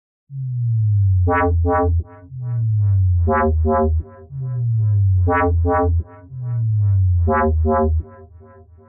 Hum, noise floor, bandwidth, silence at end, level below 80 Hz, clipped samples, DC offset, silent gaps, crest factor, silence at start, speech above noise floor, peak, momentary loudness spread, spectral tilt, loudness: none; -44 dBFS; 2.9 kHz; 0.65 s; -28 dBFS; under 0.1%; under 0.1%; none; 8 dB; 0.3 s; 27 dB; -10 dBFS; 13 LU; -6 dB/octave; -18 LUFS